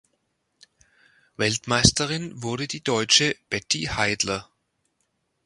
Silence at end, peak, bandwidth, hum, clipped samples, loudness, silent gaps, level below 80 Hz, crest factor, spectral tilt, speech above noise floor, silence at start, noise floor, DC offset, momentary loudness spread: 1 s; 0 dBFS; 11.5 kHz; none; under 0.1%; -22 LUFS; none; -48 dBFS; 26 dB; -2.5 dB/octave; 50 dB; 1.4 s; -74 dBFS; under 0.1%; 11 LU